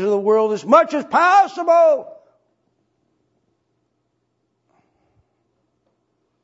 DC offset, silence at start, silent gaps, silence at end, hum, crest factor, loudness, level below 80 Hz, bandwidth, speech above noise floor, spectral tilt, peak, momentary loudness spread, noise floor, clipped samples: under 0.1%; 0 s; none; 4.3 s; none; 20 dB; -15 LUFS; -76 dBFS; 8 kHz; 55 dB; -5 dB/octave; 0 dBFS; 4 LU; -71 dBFS; under 0.1%